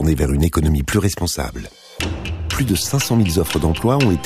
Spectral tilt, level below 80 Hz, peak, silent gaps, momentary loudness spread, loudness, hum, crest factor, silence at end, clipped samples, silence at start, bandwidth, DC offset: -5.5 dB/octave; -28 dBFS; -2 dBFS; none; 10 LU; -19 LUFS; none; 16 dB; 0 s; under 0.1%; 0 s; 15.5 kHz; under 0.1%